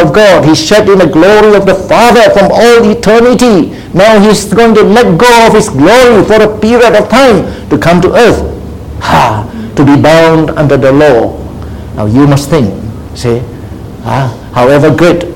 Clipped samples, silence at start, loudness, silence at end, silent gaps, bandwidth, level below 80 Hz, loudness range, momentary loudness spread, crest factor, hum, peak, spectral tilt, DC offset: 7%; 0 s; -5 LUFS; 0 s; none; 17 kHz; -28 dBFS; 5 LU; 12 LU; 4 dB; none; 0 dBFS; -5.5 dB/octave; 1%